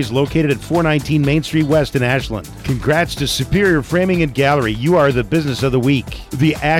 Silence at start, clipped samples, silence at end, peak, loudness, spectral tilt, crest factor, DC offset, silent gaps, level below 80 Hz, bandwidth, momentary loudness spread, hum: 0 s; under 0.1%; 0 s; -4 dBFS; -16 LUFS; -6 dB/octave; 12 dB; under 0.1%; none; -34 dBFS; 16.5 kHz; 5 LU; none